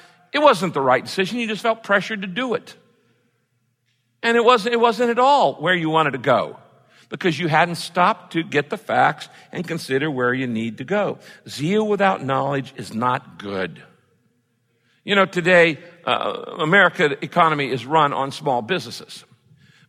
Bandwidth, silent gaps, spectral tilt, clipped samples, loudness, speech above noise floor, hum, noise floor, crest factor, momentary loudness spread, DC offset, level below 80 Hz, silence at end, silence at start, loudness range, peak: 15.5 kHz; none; -5 dB/octave; under 0.1%; -19 LUFS; 49 dB; none; -68 dBFS; 18 dB; 13 LU; under 0.1%; -68 dBFS; 0.7 s; 0.35 s; 5 LU; -2 dBFS